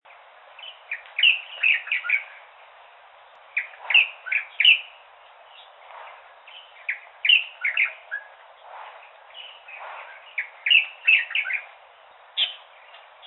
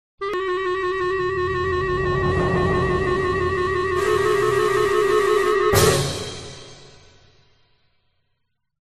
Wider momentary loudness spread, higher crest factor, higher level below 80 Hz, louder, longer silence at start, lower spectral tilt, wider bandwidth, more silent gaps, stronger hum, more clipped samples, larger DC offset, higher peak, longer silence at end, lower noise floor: first, 24 LU vs 8 LU; about the same, 22 dB vs 18 dB; second, -90 dBFS vs -40 dBFS; about the same, -20 LUFS vs -20 LUFS; first, 0.6 s vs 0.2 s; second, 1.5 dB/octave vs -5 dB/octave; second, 4.2 kHz vs 13.5 kHz; neither; neither; neither; second, under 0.1% vs 0.4%; about the same, -4 dBFS vs -2 dBFS; second, 0.7 s vs 1.9 s; second, -51 dBFS vs -75 dBFS